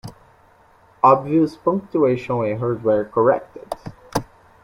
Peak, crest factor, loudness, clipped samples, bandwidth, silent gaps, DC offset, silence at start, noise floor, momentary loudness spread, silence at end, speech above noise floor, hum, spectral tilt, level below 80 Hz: -2 dBFS; 20 dB; -19 LUFS; under 0.1%; 16.5 kHz; none; under 0.1%; 0.05 s; -53 dBFS; 17 LU; 0.4 s; 34 dB; none; -7.5 dB/octave; -54 dBFS